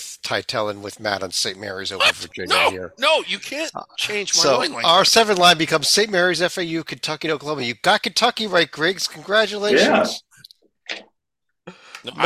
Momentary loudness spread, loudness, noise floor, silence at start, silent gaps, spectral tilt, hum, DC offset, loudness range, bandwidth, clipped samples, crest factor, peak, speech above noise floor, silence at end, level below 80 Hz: 14 LU; -18 LUFS; -80 dBFS; 0 s; none; -2 dB/octave; none; under 0.1%; 4 LU; 16 kHz; under 0.1%; 20 dB; 0 dBFS; 60 dB; 0 s; -58 dBFS